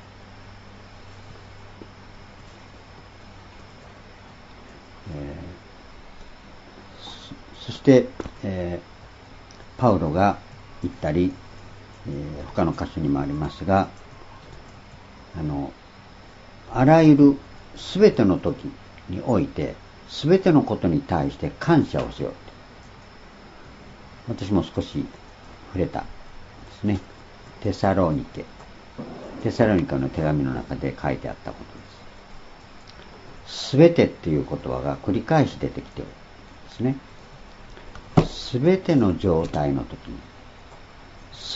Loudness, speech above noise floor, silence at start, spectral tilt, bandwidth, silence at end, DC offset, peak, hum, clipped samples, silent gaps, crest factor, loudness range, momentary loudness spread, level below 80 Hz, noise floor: -22 LUFS; 24 dB; 0 s; -7.5 dB/octave; 8 kHz; 0 s; under 0.1%; 0 dBFS; none; under 0.1%; none; 24 dB; 20 LU; 27 LU; -46 dBFS; -46 dBFS